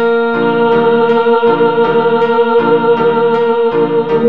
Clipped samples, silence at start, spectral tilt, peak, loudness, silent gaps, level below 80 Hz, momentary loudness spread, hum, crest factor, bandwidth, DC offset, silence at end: under 0.1%; 0 s; -8 dB/octave; 0 dBFS; -11 LUFS; none; -52 dBFS; 2 LU; none; 10 dB; 4.9 kHz; 2%; 0 s